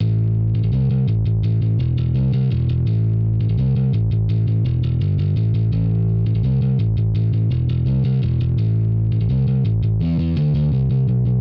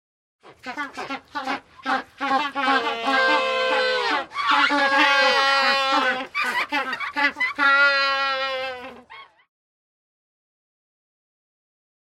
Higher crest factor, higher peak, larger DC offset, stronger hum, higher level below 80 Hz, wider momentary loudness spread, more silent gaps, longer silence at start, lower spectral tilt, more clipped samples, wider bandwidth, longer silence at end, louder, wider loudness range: second, 6 dB vs 20 dB; second, -12 dBFS vs -4 dBFS; neither; neither; first, -30 dBFS vs -68 dBFS; second, 1 LU vs 15 LU; neither; second, 0 s vs 0.45 s; first, -11.5 dB/octave vs -1.5 dB/octave; neither; second, 4.8 kHz vs 16 kHz; second, 0 s vs 2.9 s; about the same, -19 LUFS vs -20 LUFS; second, 0 LU vs 7 LU